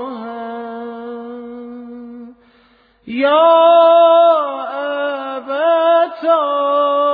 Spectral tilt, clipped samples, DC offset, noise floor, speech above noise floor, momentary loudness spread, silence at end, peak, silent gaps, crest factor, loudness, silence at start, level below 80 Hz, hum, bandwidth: -6.5 dB/octave; under 0.1%; under 0.1%; -53 dBFS; 42 dB; 22 LU; 0 s; 0 dBFS; none; 14 dB; -13 LUFS; 0 s; -66 dBFS; none; 4.9 kHz